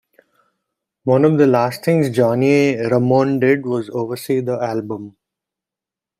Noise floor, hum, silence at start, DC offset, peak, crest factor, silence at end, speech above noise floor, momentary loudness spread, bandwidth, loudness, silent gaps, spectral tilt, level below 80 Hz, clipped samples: -87 dBFS; none; 1.05 s; under 0.1%; -2 dBFS; 16 dB; 1.1 s; 71 dB; 10 LU; 15.5 kHz; -17 LUFS; none; -7.5 dB/octave; -60 dBFS; under 0.1%